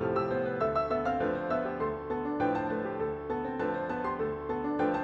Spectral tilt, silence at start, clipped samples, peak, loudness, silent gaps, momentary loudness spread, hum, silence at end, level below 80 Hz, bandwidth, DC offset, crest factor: -8.5 dB/octave; 0 s; under 0.1%; -18 dBFS; -32 LUFS; none; 4 LU; none; 0 s; -54 dBFS; 7.4 kHz; under 0.1%; 14 dB